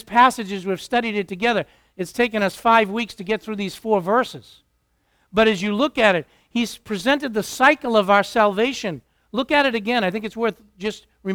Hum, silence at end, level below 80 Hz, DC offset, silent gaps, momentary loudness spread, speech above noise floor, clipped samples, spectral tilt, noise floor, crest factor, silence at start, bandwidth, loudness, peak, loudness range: none; 0 s; -54 dBFS; under 0.1%; none; 13 LU; 46 dB; under 0.1%; -4.5 dB/octave; -67 dBFS; 20 dB; 0.1 s; 19 kHz; -20 LUFS; 0 dBFS; 3 LU